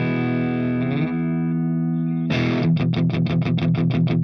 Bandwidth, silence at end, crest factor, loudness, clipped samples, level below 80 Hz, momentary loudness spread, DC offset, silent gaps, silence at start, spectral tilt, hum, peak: 6 kHz; 0 s; 10 dB; -21 LUFS; under 0.1%; -52 dBFS; 3 LU; under 0.1%; none; 0 s; -9 dB/octave; none; -10 dBFS